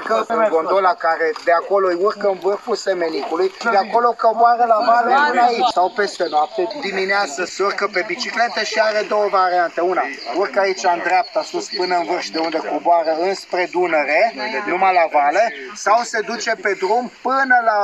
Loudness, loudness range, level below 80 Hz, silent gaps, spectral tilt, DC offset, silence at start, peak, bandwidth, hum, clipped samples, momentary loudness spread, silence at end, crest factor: -18 LUFS; 3 LU; -70 dBFS; none; -3 dB/octave; under 0.1%; 0 s; -2 dBFS; 11 kHz; none; under 0.1%; 7 LU; 0 s; 14 dB